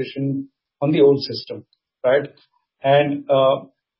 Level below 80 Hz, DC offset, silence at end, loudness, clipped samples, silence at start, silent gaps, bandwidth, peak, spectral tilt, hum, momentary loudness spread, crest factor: -68 dBFS; under 0.1%; 0.35 s; -19 LUFS; under 0.1%; 0 s; none; 5.8 kHz; -4 dBFS; -10.5 dB/octave; none; 18 LU; 16 dB